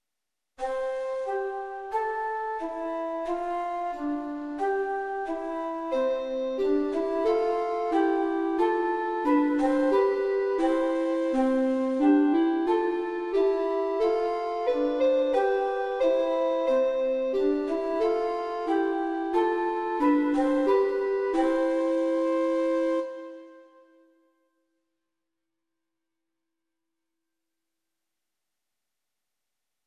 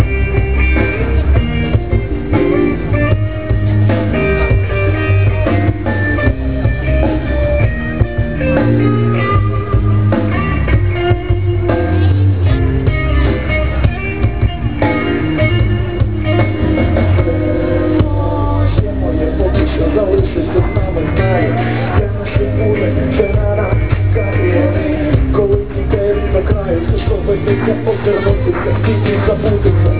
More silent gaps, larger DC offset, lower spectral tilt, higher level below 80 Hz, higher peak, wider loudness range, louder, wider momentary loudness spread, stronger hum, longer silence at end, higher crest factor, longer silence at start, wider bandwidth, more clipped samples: neither; second, under 0.1% vs 4%; second, -5 dB/octave vs -11.5 dB/octave; second, -62 dBFS vs -18 dBFS; second, -12 dBFS vs 0 dBFS; first, 6 LU vs 1 LU; second, -26 LUFS vs -14 LUFS; first, 8 LU vs 3 LU; neither; first, 6.25 s vs 0 s; about the same, 16 dB vs 12 dB; first, 0.6 s vs 0 s; first, 10 kHz vs 4 kHz; neither